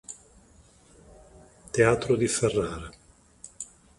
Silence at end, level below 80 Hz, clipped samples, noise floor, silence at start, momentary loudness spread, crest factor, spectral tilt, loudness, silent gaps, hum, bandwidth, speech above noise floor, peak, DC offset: 0.35 s; -52 dBFS; under 0.1%; -57 dBFS; 0.1 s; 23 LU; 24 dB; -4.5 dB/octave; -25 LUFS; none; none; 11.5 kHz; 32 dB; -6 dBFS; under 0.1%